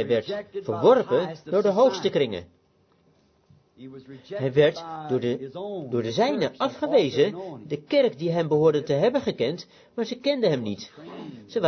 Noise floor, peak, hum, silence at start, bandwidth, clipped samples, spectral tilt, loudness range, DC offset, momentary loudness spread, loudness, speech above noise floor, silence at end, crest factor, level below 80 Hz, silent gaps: -64 dBFS; -6 dBFS; none; 0 s; 6.6 kHz; under 0.1%; -6.5 dB/octave; 5 LU; under 0.1%; 17 LU; -24 LUFS; 39 dB; 0 s; 18 dB; -64 dBFS; none